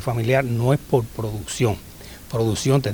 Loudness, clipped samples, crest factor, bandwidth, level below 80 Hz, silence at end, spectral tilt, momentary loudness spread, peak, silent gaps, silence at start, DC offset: -22 LUFS; under 0.1%; 16 dB; over 20 kHz; -44 dBFS; 0 s; -6 dB/octave; 11 LU; -4 dBFS; none; 0 s; under 0.1%